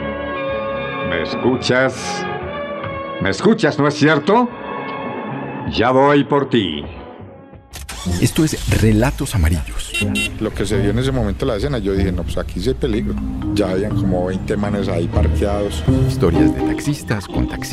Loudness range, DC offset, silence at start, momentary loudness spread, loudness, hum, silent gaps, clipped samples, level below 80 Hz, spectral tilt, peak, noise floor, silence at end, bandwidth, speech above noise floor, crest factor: 3 LU; under 0.1%; 0 s; 11 LU; -18 LUFS; none; none; under 0.1%; -30 dBFS; -6 dB/octave; -2 dBFS; -39 dBFS; 0 s; 14.5 kHz; 22 dB; 14 dB